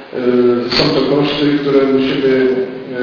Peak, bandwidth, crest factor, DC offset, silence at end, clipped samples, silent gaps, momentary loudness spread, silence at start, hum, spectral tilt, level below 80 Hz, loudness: 0 dBFS; 5.4 kHz; 14 dB; under 0.1%; 0 s; under 0.1%; none; 3 LU; 0 s; none; -6.5 dB/octave; -46 dBFS; -13 LUFS